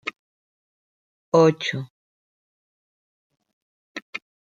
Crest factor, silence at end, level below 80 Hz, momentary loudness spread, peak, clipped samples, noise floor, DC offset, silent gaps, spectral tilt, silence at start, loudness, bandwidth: 24 dB; 0.4 s; -74 dBFS; 22 LU; -4 dBFS; under 0.1%; under -90 dBFS; under 0.1%; 0.19-1.32 s, 1.90-3.30 s, 3.53-3.95 s, 4.02-4.13 s; -6 dB/octave; 0.05 s; -20 LUFS; 7.6 kHz